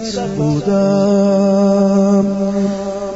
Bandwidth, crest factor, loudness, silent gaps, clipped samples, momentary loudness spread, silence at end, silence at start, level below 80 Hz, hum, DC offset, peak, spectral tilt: 8 kHz; 10 dB; -14 LUFS; none; under 0.1%; 6 LU; 0 s; 0 s; -44 dBFS; none; under 0.1%; -4 dBFS; -7.5 dB/octave